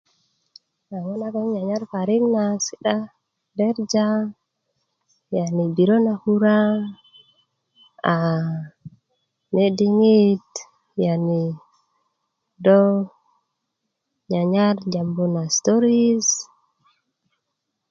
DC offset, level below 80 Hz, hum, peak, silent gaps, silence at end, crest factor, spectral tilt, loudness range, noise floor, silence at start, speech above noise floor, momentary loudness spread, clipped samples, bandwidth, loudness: under 0.1%; -68 dBFS; none; -2 dBFS; none; 1.5 s; 20 dB; -5.5 dB/octave; 4 LU; -79 dBFS; 0.9 s; 59 dB; 15 LU; under 0.1%; 7.6 kHz; -20 LUFS